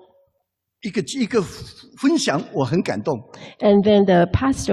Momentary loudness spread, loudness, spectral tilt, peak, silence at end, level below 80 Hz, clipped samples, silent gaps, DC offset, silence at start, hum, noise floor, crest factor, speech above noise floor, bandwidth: 16 LU; -19 LUFS; -6 dB/octave; -6 dBFS; 0 s; -40 dBFS; under 0.1%; none; under 0.1%; 0.85 s; none; -74 dBFS; 14 dB; 55 dB; 12.5 kHz